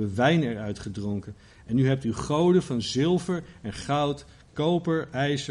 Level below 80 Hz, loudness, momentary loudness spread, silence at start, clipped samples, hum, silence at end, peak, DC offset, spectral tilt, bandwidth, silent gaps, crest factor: -52 dBFS; -26 LUFS; 13 LU; 0 s; under 0.1%; none; 0 s; -10 dBFS; under 0.1%; -6.5 dB/octave; 11.5 kHz; none; 16 dB